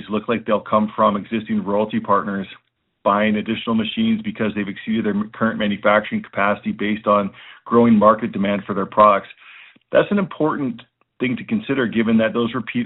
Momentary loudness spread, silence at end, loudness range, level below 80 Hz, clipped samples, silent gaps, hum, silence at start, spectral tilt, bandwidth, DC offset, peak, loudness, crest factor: 10 LU; 0 s; 4 LU; -56 dBFS; under 0.1%; none; none; 0 s; -4.5 dB/octave; 4.1 kHz; under 0.1%; 0 dBFS; -19 LUFS; 18 dB